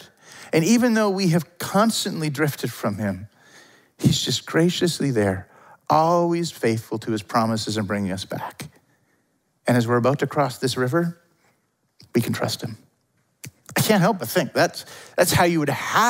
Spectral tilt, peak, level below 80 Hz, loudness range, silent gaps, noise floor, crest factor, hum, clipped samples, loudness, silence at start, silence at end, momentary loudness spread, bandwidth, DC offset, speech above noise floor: -5 dB/octave; -4 dBFS; -58 dBFS; 4 LU; none; -68 dBFS; 18 dB; none; under 0.1%; -22 LUFS; 0 s; 0 s; 13 LU; 16.5 kHz; under 0.1%; 47 dB